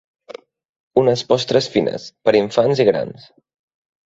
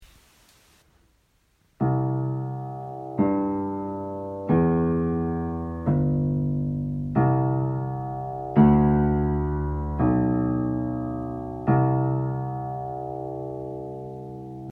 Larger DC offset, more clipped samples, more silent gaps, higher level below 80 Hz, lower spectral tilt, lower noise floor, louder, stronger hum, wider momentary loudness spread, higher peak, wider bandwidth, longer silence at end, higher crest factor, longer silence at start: neither; neither; first, 0.69-0.91 s vs none; second, -58 dBFS vs -40 dBFS; second, -5.5 dB/octave vs -11.5 dB/octave; second, -40 dBFS vs -65 dBFS; first, -17 LUFS vs -25 LUFS; neither; second, 7 LU vs 12 LU; first, -2 dBFS vs -6 dBFS; first, 8 kHz vs 3.2 kHz; first, 0.95 s vs 0 s; about the same, 18 dB vs 20 dB; first, 0.3 s vs 0 s